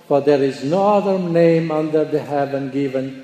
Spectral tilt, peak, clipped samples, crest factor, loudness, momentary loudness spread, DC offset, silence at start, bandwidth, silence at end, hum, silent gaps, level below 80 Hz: -8 dB/octave; -4 dBFS; under 0.1%; 14 dB; -18 LUFS; 7 LU; under 0.1%; 0.1 s; 9.6 kHz; 0 s; none; none; -64 dBFS